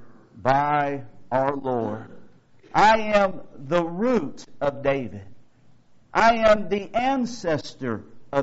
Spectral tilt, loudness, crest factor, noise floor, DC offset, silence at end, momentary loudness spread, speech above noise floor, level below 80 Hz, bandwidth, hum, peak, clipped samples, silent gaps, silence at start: -4 dB/octave; -23 LUFS; 18 dB; -51 dBFS; under 0.1%; 0 s; 14 LU; 29 dB; -50 dBFS; 8 kHz; none; -4 dBFS; under 0.1%; none; 0 s